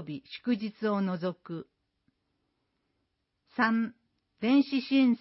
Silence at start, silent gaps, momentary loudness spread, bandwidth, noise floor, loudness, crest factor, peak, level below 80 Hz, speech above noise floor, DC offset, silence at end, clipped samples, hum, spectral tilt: 0 s; none; 16 LU; 5.8 kHz; -80 dBFS; -29 LUFS; 18 dB; -12 dBFS; -78 dBFS; 51 dB; under 0.1%; 0.05 s; under 0.1%; none; -9.5 dB/octave